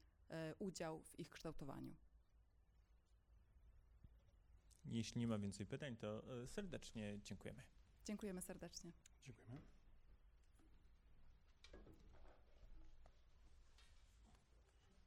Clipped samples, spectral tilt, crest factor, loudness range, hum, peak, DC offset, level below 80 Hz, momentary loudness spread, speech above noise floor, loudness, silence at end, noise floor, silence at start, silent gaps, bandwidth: under 0.1%; -5.5 dB/octave; 22 dB; 15 LU; none; -34 dBFS; under 0.1%; -68 dBFS; 17 LU; 23 dB; -52 LUFS; 0 s; -74 dBFS; 0 s; none; 15.5 kHz